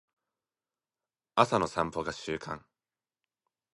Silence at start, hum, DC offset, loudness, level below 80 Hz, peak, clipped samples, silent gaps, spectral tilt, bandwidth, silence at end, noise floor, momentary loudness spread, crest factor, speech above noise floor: 1.35 s; none; under 0.1%; -31 LUFS; -62 dBFS; -6 dBFS; under 0.1%; none; -5 dB/octave; 11.5 kHz; 1.2 s; under -90 dBFS; 13 LU; 30 dB; over 60 dB